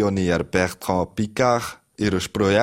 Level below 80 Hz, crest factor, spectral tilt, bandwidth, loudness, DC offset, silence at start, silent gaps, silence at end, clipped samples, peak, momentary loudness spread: -46 dBFS; 18 dB; -5.5 dB/octave; 16 kHz; -22 LUFS; under 0.1%; 0 s; none; 0 s; under 0.1%; -2 dBFS; 5 LU